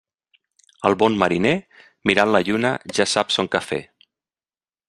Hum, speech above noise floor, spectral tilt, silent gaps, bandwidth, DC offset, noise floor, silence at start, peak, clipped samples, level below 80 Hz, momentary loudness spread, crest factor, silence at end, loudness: none; over 70 dB; -4 dB/octave; none; 12.5 kHz; under 0.1%; under -90 dBFS; 0.8 s; -2 dBFS; under 0.1%; -58 dBFS; 7 LU; 20 dB; 1.05 s; -20 LUFS